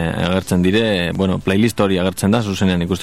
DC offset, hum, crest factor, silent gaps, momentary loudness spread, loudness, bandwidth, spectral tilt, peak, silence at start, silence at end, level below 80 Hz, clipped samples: 0.9%; none; 14 dB; none; 3 LU; -17 LUFS; 14.5 kHz; -6 dB/octave; -2 dBFS; 0 s; 0 s; -42 dBFS; under 0.1%